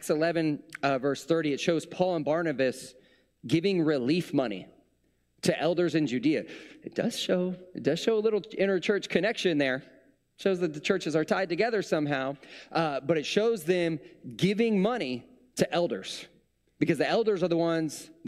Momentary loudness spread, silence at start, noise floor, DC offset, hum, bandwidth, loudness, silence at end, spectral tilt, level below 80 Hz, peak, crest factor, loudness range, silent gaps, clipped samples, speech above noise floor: 9 LU; 0 s; -71 dBFS; under 0.1%; none; 14.5 kHz; -28 LUFS; 0 s; -5.5 dB/octave; -70 dBFS; -10 dBFS; 20 dB; 2 LU; none; under 0.1%; 44 dB